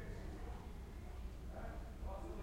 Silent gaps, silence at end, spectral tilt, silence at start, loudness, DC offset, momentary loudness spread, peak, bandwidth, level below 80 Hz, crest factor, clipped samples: none; 0 s; -7 dB/octave; 0 s; -51 LUFS; under 0.1%; 3 LU; -36 dBFS; 16 kHz; -50 dBFS; 12 dB; under 0.1%